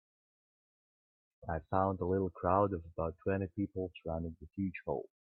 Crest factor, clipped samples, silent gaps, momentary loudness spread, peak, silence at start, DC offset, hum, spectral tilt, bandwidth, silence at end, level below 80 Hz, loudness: 22 dB; under 0.1%; none; 10 LU; -14 dBFS; 1.4 s; under 0.1%; none; -11.5 dB/octave; 4.1 kHz; 0.3 s; -60 dBFS; -36 LUFS